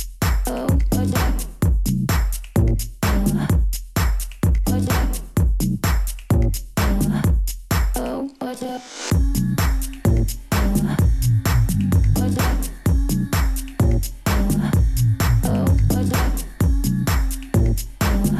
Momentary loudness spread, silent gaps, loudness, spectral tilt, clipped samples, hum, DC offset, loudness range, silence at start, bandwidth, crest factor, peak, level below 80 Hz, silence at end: 5 LU; none; -21 LUFS; -6 dB/octave; under 0.1%; none; under 0.1%; 3 LU; 0 s; 15 kHz; 12 dB; -6 dBFS; -22 dBFS; 0 s